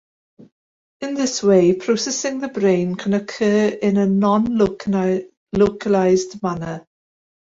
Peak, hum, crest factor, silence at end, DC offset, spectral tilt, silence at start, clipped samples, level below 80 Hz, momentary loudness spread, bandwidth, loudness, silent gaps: -4 dBFS; none; 16 dB; 0.6 s; under 0.1%; -5.5 dB/octave; 1 s; under 0.1%; -52 dBFS; 10 LU; 7.8 kHz; -19 LUFS; 5.37-5.47 s